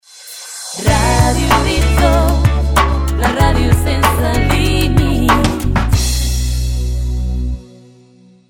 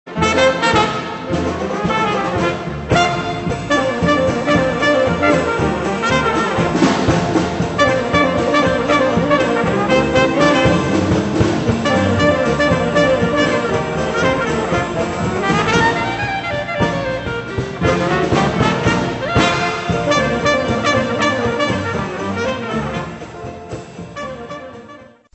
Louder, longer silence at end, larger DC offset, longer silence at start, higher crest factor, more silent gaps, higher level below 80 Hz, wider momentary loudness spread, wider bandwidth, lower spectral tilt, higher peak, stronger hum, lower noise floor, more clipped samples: about the same, -14 LUFS vs -16 LUFS; first, 0.85 s vs 0.3 s; neither; about the same, 0.15 s vs 0.05 s; about the same, 14 dB vs 16 dB; neither; first, -18 dBFS vs -36 dBFS; about the same, 9 LU vs 8 LU; first, 18 kHz vs 8.4 kHz; about the same, -5 dB/octave vs -5.5 dB/octave; about the same, 0 dBFS vs 0 dBFS; neither; first, -45 dBFS vs -40 dBFS; neither